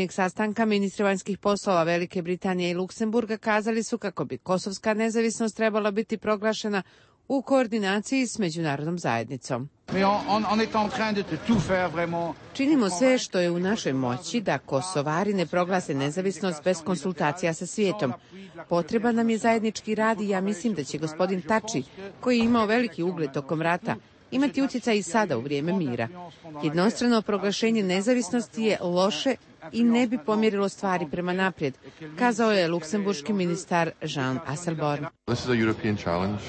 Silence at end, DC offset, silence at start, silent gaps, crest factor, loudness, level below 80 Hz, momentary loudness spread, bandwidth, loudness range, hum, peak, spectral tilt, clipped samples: 0 s; under 0.1%; 0 s; none; 16 dB; -26 LUFS; -60 dBFS; 7 LU; 8.8 kHz; 2 LU; none; -10 dBFS; -5 dB/octave; under 0.1%